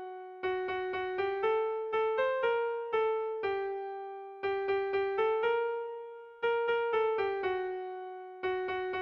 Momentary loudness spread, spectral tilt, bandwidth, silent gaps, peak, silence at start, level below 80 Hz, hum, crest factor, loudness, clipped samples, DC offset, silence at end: 11 LU; -6 dB/octave; 5.6 kHz; none; -20 dBFS; 0 s; -70 dBFS; none; 12 dB; -33 LUFS; under 0.1%; under 0.1%; 0 s